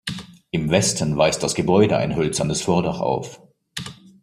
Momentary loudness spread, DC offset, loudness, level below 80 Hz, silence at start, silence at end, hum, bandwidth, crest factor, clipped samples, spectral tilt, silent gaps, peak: 16 LU; under 0.1%; -20 LUFS; -48 dBFS; 0.05 s; 0.3 s; none; 15 kHz; 20 dB; under 0.1%; -4.5 dB/octave; none; -2 dBFS